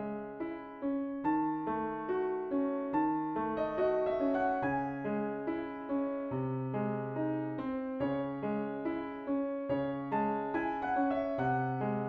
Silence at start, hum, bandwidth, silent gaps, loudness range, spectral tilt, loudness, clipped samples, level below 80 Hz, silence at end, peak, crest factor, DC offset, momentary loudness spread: 0 s; none; 4.9 kHz; none; 3 LU; -10 dB/octave; -34 LUFS; under 0.1%; -64 dBFS; 0 s; -20 dBFS; 14 dB; under 0.1%; 6 LU